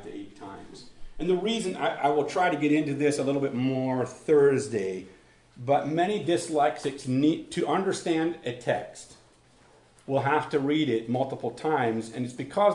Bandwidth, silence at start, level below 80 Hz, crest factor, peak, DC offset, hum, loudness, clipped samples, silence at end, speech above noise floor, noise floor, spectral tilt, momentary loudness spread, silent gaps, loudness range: 11 kHz; 0 s; -58 dBFS; 18 dB; -10 dBFS; under 0.1%; none; -27 LUFS; under 0.1%; 0 s; 32 dB; -58 dBFS; -5.5 dB/octave; 14 LU; none; 4 LU